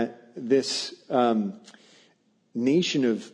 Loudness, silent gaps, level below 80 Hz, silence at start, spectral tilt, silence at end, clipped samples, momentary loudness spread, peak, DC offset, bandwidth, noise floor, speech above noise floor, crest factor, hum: -25 LUFS; none; -76 dBFS; 0 s; -5 dB/octave; 0.05 s; under 0.1%; 14 LU; -10 dBFS; under 0.1%; 10.5 kHz; -65 dBFS; 40 dB; 16 dB; none